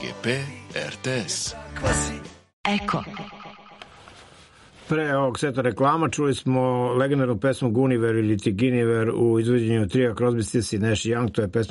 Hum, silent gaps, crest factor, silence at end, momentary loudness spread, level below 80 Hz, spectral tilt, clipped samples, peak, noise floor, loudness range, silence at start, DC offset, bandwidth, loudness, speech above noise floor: none; 2.53-2.64 s; 16 dB; 0 s; 9 LU; -46 dBFS; -5.5 dB/octave; under 0.1%; -8 dBFS; -50 dBFS; 7 LU; 0 s; under 0.1%; 11.5 kHz; -23 LUFS; 27 dB